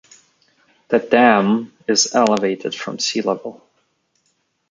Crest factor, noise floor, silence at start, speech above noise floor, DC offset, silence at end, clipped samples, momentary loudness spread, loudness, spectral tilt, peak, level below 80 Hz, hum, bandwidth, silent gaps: 18 dB; -67 dBFS; 0.9 s; 50 dB; under 0.1%; 1.2 s; under 0.1%; 12 LU; -17 LUFS; -3 dB/octave; -2 dBFS; -66 dBFS; none; 9.6 kHz; none